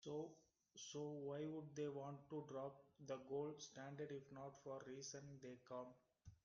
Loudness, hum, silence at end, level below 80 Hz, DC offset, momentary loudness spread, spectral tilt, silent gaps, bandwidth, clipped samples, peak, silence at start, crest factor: -53 LUFS; none; 0.1 s; -84 dBFS; under 0.1%; 9 LU; -5.5 dB/octave; none; 7.2 kHz; under 0.1%; -36 dBFS; 0 s; 16 dB